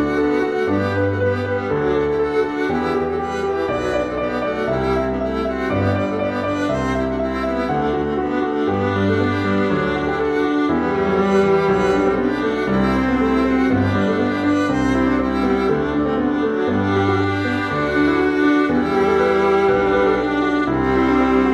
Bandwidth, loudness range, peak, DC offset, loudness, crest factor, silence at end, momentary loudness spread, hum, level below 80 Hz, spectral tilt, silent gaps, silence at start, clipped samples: 11 kHz; 4 LU; -4 dBFS; under 0.1%; -18 LUFS; 12 dB; 0 s; 5 LU; none; -38 dBFS; -7 dB/octave; none; 0 s; under 0.1%